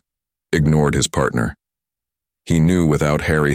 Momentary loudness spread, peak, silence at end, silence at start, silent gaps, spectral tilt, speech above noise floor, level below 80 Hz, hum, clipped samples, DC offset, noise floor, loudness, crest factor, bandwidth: 7 LU; -2 dBFS; 0 s; 0.5 s; none; -6 dB/octave; 71 dB; -34 dBFS; none; under 0.1%; under 0.1%; -87 dBFS; -18 LUFS; 18 dB; 15 kHz